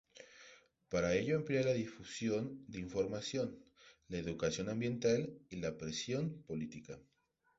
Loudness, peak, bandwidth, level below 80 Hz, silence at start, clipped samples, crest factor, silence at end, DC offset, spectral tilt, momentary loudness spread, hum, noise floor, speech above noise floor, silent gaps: -39 LUFS; -22 dBFS; 8 kHz; -64 dBFS; 0.15 s; under 0.1%; 18 dB; 0.55 s; under 0.1%; -5.5 dB/octave; 20 LU; none; -63 dBFS; 25 dB; none